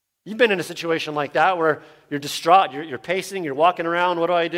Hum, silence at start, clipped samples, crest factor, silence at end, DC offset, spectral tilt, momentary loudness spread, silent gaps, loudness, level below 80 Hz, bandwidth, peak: none; 0.25 s; under 0.1%; 18 dB; 0 s; under 0.1%; -4 dB/octave; 12 LU; none; -21 LUFS; -70 dBFS; 16.5 kHz; -4 dBFS